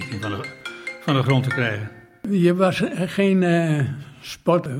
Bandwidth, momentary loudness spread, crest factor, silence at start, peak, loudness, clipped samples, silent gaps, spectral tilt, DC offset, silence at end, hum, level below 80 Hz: 15.5 kHz; 15 LU; 18 dB; 0 s; -2 dBFS; -21 LUFS; under 0.1%; none; -7 dB/octave; under 0.1%; 0 s; none; -60 dBFS